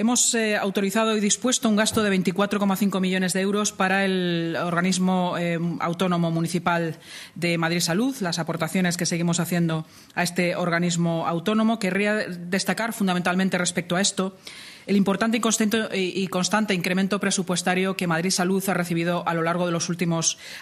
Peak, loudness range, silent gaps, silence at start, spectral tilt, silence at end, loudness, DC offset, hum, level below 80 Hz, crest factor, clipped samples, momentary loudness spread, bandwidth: -6 dBFS; 2 LU; none; 0 s; -4 dB/octave; 0 s; -23 LUFS; under 0.1%; none; -64 dBFS; 18 dB; under 0.1%; 5 LU; 15 kHz